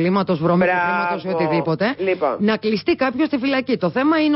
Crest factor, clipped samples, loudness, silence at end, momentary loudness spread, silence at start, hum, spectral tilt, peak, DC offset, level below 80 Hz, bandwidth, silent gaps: 12 dB; under 0.1%; -19 LUFS; 0 s; 4 LU; 0 s; none; -11 dB/octave; -8 dBFS; under 0.1%; -56 dBFS; 5.8 kHz; none